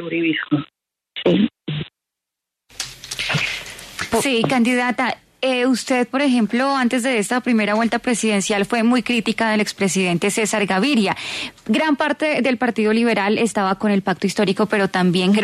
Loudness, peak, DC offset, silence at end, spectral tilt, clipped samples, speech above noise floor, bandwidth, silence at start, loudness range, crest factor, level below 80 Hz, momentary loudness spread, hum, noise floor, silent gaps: -19 LUFS; -4 dBFS; under 0.1%; 0 s; -4.5 dB/octave; under 0.1%; 65 dB; 13.5 kHz; 0 s; 5 LU; 14 dB; -56 dBFS; 9 LU; none; -84 dBFS; none